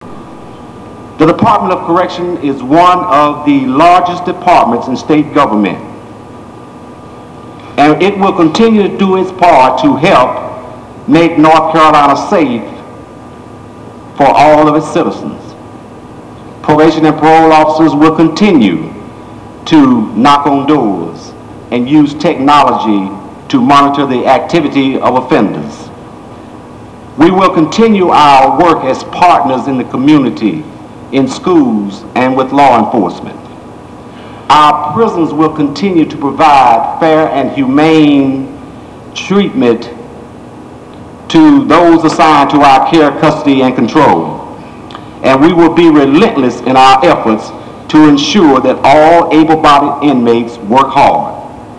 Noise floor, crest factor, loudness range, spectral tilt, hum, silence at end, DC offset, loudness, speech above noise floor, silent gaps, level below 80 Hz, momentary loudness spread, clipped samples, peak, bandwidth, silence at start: -29 dBFS; 8 dB; 5 LU; -6 dB/octave; none; 0 s; 0.4%; -8 LUFS; 22 dB; none; -40 dBFS; 19 LU; 3%; 0 dBFS; 11 kHz; 0 s